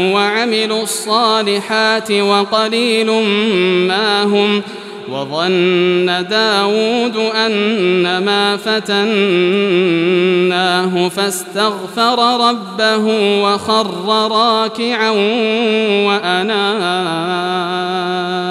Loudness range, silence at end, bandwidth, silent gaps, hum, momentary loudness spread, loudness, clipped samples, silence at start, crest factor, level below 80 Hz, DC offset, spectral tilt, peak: 1 LU; 0 s; 14 kHz; none; none; 5 LU; -14 LUFS; under 0.1%; 0 s; 14 dB; -68 dBFS; under 0.1%; -4 dB/octave; 0 dBFS